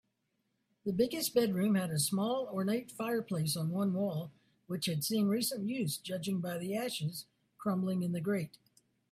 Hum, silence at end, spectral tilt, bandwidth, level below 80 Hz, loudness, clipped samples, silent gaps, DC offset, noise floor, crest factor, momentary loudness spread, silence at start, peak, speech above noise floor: none; 0.65 s; -5 dB/octave; 16 kHz; -74 dBFS; -34 LUFS; under 0.1%; none; under 0.1%; -81 dBFS; 18 dB; 8 LU; 0.85 s; -18 dBFS; 47 dB